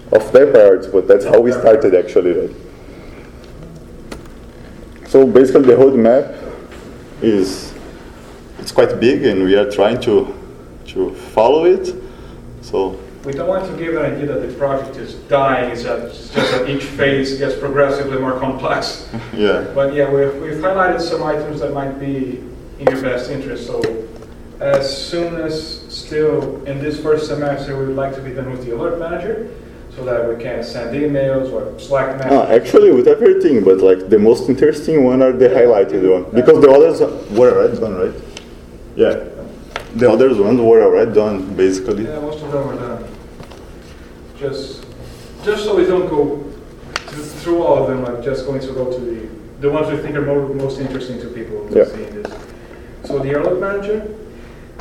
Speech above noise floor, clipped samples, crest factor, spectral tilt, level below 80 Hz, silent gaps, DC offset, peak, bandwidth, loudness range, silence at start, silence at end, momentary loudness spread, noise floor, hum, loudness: 22 dB; 0.1%; 16 dB; -6.5 dB/octave; -40 dBFS; none; under 0.1%; 0 dBFS; 12.5 kHz; 10 LU; 0 s; 0 s; 21 LU; -36 dBFS; none; -15 LUFS